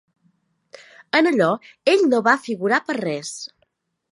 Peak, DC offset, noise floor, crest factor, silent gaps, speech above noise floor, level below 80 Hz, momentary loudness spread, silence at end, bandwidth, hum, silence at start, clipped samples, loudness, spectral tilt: -2 dBFS; under 0.1%; -68 dBFS; 20 dB; none; 49 dB; -76 dBFS; 13 LU; 0.65 s; 11.5 kHz; none; 1.15 s; under 0.1%; -19 LUFS; -4.5 dB/octave